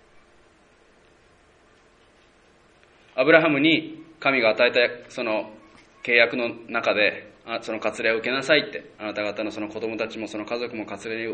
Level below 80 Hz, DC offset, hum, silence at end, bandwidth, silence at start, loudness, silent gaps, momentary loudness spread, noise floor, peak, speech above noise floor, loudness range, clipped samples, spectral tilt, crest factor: -66 dBFS; under 0.1%; none; 0 s; 9.4 kHz; 3.15 s; -23 LUFS; none; 14 LU; -57 dBFS; 0 dBFS; 34 dB; 5 LU; under 0.1%; -4.5 dB/octave; 26 dB